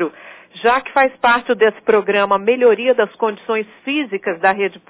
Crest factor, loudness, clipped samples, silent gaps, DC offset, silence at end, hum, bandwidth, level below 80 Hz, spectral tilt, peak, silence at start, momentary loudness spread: 14 dB; -16 LUFS; under 0.1%; none; under 0.1%; 0.1 s; none; 4 kHz; -60 dBFS; -8 dB/octave; -2 dBFS; 0 s; 8 LU